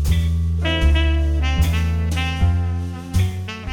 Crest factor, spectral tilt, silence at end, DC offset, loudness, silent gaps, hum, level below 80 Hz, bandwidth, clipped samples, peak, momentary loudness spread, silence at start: 12 dB; -6 dB/octave; 0 s; under 0.1%; -20 LUFS; none; none; -22 dBFS; 15 kHz; under 0.1%; -6 dBFS; 6 LU; 0 s